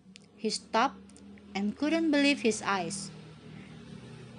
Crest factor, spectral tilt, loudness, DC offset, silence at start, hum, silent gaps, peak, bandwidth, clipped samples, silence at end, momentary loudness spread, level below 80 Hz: 20 dB; -4 dB/octave; -30 LUFS; under 0.1%; 0.1 s; none; none; -12 dBFS; 11 kHz; under 0.1%; 0 s; 23 LU; -66 dBFS